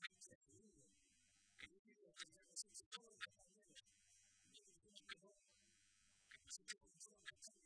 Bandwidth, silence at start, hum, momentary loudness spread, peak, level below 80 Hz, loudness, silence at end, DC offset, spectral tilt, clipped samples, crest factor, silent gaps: 11 kHz; 0 s; none; 13 LU; -36 dBFS; under -90 dBFS; -59 LUFS; 0 s; under 0.1%; 0.5 dB/octave; under 0.1%; 28 dB; 0.35-0.41 s, 1.79-1.85 s, 2.86-2.91 s